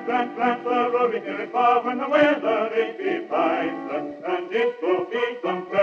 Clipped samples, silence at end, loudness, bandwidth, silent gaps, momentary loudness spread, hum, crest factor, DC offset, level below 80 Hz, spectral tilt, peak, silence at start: under 0.1%; 0 s; -23 LUFS; 7 kHz; none; 9 LU; none; 16 dB; under 0.1%; -74 dBFS; -6 dB/octave; -6 dBFS; 0 s